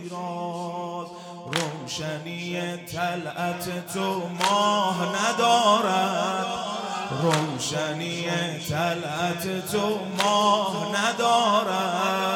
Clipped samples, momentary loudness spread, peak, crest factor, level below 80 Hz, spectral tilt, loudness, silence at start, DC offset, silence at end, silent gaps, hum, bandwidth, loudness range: under 0.1%; 11 LU; -8 dBFS; 18 dB; -66 dBFS; -4 dB/octave; -25 LUFS; 0 s; under 0.1%; 0 s; none; none; 17.5 kHz; 7 LU